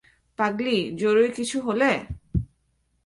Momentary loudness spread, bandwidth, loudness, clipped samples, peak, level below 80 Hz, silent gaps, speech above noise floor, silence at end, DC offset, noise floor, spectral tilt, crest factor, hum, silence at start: 10 LU; 11.5 kHz; -24 LUFS; under 0.1%; -8 dBFS; -42 dBFS; none; 47 dB; 0.6 s; under 0.1%; -69 dBFS; -5 dB/octave; 18 dB; none; 0.4 s